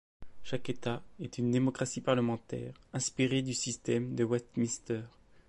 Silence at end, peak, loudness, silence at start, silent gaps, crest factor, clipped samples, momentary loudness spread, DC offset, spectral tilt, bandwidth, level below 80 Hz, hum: 0 s; -16 dBFS; -34 LUFS; 0.2 s; none; 18 dB; under 0.1%; 11 LU; under 0.1%; -5 dB/octave; 11.5 kHz; -62 dBFS; none